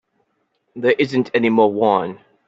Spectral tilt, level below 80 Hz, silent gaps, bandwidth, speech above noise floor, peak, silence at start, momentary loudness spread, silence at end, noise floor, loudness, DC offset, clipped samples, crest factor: -7 dB/octave; -64 dBFS; none; 7.8 kHz; 52 dB; -2 dBFS; 0.75 s; 6 LU; 0.3 s; -68 dBFS; -17 LUFS; under 0.1%; under 0.1%; 16 dB